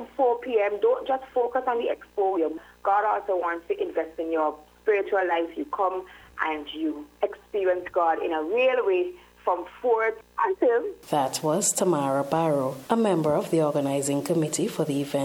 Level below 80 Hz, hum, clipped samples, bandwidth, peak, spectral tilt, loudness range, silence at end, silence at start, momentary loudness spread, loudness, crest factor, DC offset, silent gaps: -64 dBFS; 60 Hz at -65 dBFS; under 0.1%; 17.5 kHz; -6 dBFS; -4.5 dB/octave; 3 LU; 0 s; 0 s; 7 LU; -26 LUFS; 18 dB; under 0.1%; none